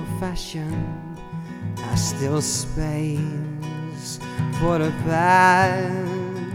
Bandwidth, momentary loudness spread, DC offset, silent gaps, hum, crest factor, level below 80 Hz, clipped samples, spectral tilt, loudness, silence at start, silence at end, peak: 16.5 kHz; 16 LU; under 0.1%; none; none; 20 dB; -40 dBFS; under 0.1%; -5 dB/octave; -23 LUFS; 0 s; 0 s; -2 dBFS